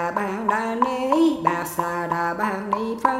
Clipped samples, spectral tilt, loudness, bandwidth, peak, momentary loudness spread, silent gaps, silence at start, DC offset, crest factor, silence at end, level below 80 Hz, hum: under 0.1%; -5.5 dB/octave; -23 LUFS; 16 kHz; -2 dBFS; 6 LU; none; 0 s; under 0.1%; 20 dB; 0 s; -58 dBFS; none